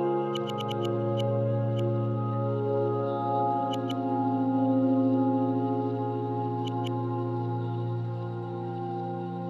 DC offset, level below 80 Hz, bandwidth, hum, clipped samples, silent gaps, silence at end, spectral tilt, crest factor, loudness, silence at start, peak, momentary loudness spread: under 0.1%; -80 dBFS; 7.4 kHz; none; under 0.1%; none; 0 s; -9 dB/octave; 14 dB; -29 LUFS; 0 s; -14 dBFS; 8 LU